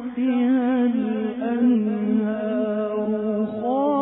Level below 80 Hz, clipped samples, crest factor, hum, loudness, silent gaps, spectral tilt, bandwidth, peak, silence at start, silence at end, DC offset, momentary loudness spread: -62 dBFS; under 0.1%; 10 dB; none; -22 LUFS; none; -11.5 dB/octave; 3.8 kHz; -10 dBFS; 0 s; 0 s; under 0.1%; 5 LU